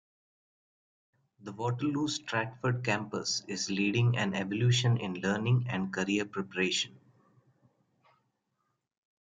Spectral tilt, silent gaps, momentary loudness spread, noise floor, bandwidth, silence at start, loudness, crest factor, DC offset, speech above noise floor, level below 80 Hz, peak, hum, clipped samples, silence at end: -5 dB/octave; none; 7 LU; -81 dBFS; 9.4 kHz; 1.4 s; -31 LUFS; 18 dB; under 0.1%; 50 dB; -70 dBFS; -16 dBFS; none; under 0.1%; 2.3 s